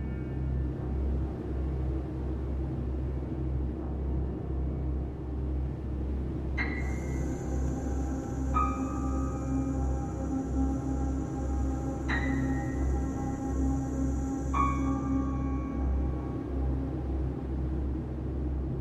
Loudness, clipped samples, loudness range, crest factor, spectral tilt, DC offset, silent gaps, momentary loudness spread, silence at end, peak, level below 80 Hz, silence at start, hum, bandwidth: -33 LUFS; under 0.1%; 3 LU; 16 dB; -8 dB/octave; under 0.1%; none; 5 LU; 0 s; -14 dBFS; -34 dBFS; 0 s; none; 8.2 kHz